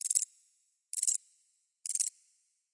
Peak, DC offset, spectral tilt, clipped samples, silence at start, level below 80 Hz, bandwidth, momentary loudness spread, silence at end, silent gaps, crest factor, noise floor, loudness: -12 dBFS; under 0.1%; 9 dB/octave; under 0.1%; 0.05 s; under -90 dBFS; 11.5 kHz; 9 LU; 0.65 s; none; 26 dB; -74 dBFS; -33 LUFS